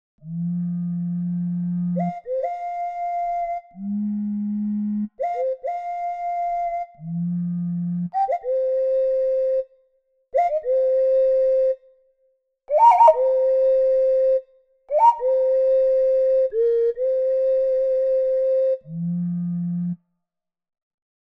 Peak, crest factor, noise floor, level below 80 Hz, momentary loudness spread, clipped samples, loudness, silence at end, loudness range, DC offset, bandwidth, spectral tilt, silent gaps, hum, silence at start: -2 dBFS; 18 dB; -82 dBFS; -60 dBFS; 10 LU; under 0.1%; -21 LUFS; 1.4 s; 8 LU; under 0.1%; 5 kHz; -10 dB/octave; none; none; 0.25 s